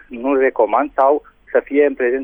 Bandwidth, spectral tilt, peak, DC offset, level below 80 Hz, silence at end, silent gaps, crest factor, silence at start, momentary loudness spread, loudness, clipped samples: 3.6 kHz; -8 dB/octave; -4 dBFS; under 0.1%; -52 dBFS; 0 s; none; 14 dB; 0.1 s; 5 LU; -17 LUFS; under 0.1%